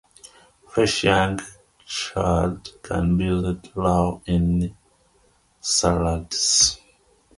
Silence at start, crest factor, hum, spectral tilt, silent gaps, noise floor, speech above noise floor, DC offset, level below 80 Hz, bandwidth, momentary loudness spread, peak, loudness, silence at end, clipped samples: 0.75 s; 20 dB; none; -4 dB/octave; none; -61 dBFS; 39 dB; under 0.1%; -36 dBFS; 11.5 kHz; 13 LU; -4 dBFS; -21 LUFS; 0.6 s; under 0.1%